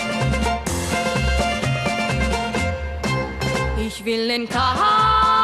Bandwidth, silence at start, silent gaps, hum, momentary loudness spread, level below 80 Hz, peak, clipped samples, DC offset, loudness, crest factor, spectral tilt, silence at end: 14 kHz; 0 s; none; none; 8 LU; -30 dBFS; -6 dBFS; under 0.1%; under 0.1%; -20 LUFS; 14 dB; -4.5 dB/octave; 0 s